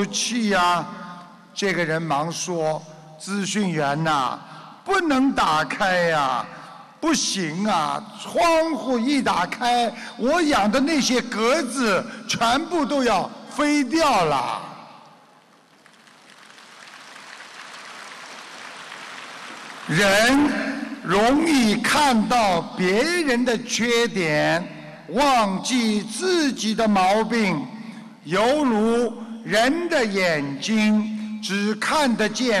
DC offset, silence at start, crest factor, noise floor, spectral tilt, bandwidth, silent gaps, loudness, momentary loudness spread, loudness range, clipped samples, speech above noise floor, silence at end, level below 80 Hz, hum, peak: under 0.1%; 0 s; 12 dB; -54 dBFS; -4 dB/octave; 13 kHz; none; -21 LUFS; 18 LU; 6 LU; under 0.1%; 33 dB; 0 s; -52 dBFS; none; -10 dBFS